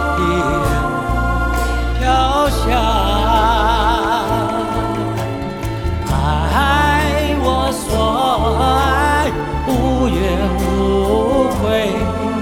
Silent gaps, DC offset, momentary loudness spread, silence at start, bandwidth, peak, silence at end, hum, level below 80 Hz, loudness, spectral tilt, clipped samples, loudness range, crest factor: none; under 0.1%; 6 LU; 0 s; 17.5 kHz; 0 dBFS; 0 s; none; -22 dBFS; -16 LUFS; -5.5 dB/octave; under 0.1%; 2 LU; 14 dB